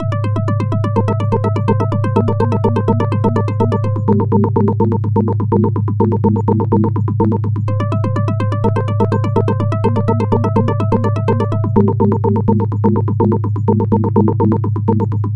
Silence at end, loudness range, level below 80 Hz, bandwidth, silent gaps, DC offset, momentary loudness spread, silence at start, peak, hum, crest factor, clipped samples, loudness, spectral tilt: 0 s; 1 LU; -42 dBFS; 4.4 kHz; none; 1%; 3 LU; 0 s; 0 dBFS; none; 14 dB; under 0.1%; -15 LUFS; -10.5 dB/octave